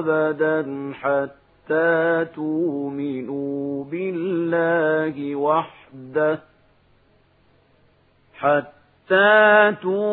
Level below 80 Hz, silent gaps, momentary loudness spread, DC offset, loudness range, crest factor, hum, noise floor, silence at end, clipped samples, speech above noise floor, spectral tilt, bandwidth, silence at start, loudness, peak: -68 dBFS; none; 13 LU; under 0.1%; 7 LU; 20 dB; none; -59 dBFS; 0 s; under 0.1%; 38 dB; -10.5 dB/octave; 4.3 kHz; 0 s; -21 LUFS; -2 dBFS